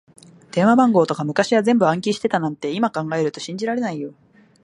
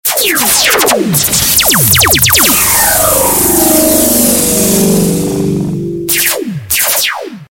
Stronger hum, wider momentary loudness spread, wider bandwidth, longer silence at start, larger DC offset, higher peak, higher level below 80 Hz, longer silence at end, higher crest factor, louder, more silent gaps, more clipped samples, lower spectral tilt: neither; first, 12 LU vs 8 LU; second, 11 kHz vs over 20 kHz; first, 0.55 s vs 0.05 s; neither; about the same, -2 dBFS vs 0 dBFS; second, -66 dBFS vs -32 dBFS; first, 0.55 s vs 0.05 s; first, 18 dB vs 10 dB; second, -19 LUFS vs -8 LUFS; neither; second, under 0.1% vs 0.3%; first, -6 dB/octave vs -2.5 dB/octave